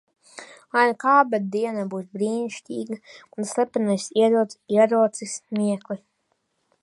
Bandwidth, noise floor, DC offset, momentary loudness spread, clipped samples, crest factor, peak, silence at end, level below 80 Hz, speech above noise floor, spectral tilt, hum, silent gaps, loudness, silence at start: 11.5 kHz; -72 dBFS; under 0.1%; 17 LU; under 0.1%; 20 dB; -4 dBFS; 0.85 s; -76 dBFS; 50 dB; -5 dB/octave; none; none; -23 LUFS; 0.35 s